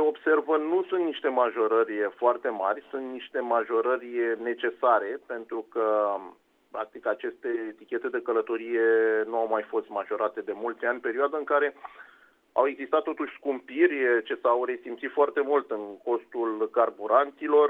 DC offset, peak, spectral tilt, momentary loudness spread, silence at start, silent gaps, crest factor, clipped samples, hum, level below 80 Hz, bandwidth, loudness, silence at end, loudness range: under 0.1%; -8 dBFS; -6 dB/octave; 10 LU; 0 s; none; 18 dB; under 0.1%; none; -78 dBFS; 3.9 kHz; -27 LUFS; 0 s; 3 LU